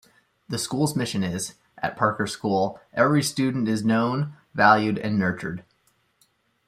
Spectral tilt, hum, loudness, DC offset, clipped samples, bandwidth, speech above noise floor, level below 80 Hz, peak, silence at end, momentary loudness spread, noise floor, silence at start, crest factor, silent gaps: -5 dB/octave; none; -24 LUFS; under 0.1%; under 0.1%; 15.5 kHz; 44 dB; -62 dBFS; -4 dBFS; 1.05 s; 12 LU; -67 dBFS; 0.5 s; 20 dB; none